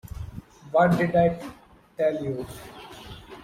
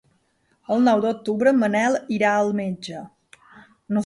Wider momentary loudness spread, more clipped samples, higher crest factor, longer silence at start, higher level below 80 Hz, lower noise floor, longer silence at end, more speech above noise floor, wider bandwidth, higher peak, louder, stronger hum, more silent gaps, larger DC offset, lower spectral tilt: first, 22 LU vs 12 LU; neither; about the same, 18 dB vs 16 dB; second, 0.05 s vs 0.7 s; first, -48 dBFS vs -66 dBFS; second, -43 dBFS vs -66 dBFS; about the same, 0 s vs 0 s; second, 20 dB vs 45 dB; first, 15.5 kHz vs 11.5 kHz; about the same, -8 dBFS vs -6 dBFS; second, -24 LUFS vs -21 LUFS; neither; neither; neither; first, -7.5 dB/octave vs -6 dB/octave